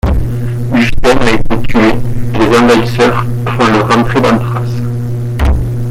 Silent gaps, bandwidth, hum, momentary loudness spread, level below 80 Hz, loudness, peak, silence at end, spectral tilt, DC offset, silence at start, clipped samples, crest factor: none; 15 kHz; none; 8 LU; -20 dBFS; -11 LUFS; 0 dBFS; 0 s; -6.5 dB/octave; under 0.1%; 0.05 s; under 0.1%; 8 dB